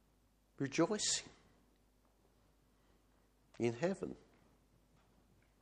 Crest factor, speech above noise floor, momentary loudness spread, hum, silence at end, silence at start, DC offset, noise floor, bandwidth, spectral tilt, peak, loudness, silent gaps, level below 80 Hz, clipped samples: 22 dB; 36 dB; 16 LU; none; 1.45 s; 0.6 s; under 0.1%; -73 dBFS; 10 kHz; -3.5 dB/octave; -22 dBFS; -38 LUFS; none; -74 dBFS; under 0.1%